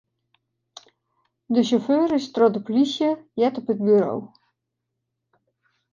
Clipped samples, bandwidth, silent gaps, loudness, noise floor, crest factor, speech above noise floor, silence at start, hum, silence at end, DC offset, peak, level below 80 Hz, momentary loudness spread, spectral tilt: under 0.1%; 7.4 kHz; none; -21 LUFS; -80 dBFS; 18 dB; 60 dB; 1.5 s; none; 1.65 s; under 0.1%; -4 dBFS; -70 dBFS; 5 LU; -6.5 dB/octave